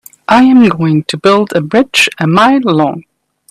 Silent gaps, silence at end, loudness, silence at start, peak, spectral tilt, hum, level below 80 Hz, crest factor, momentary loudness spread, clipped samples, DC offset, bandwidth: none; 0.5 s; -9 LUFS; 0.3 s; 0 dBFS; -5.5 dB/octave; none; -50 dBFS; 10 dB; 6 LU; under 0.1%; under 0.1%; 15 kHz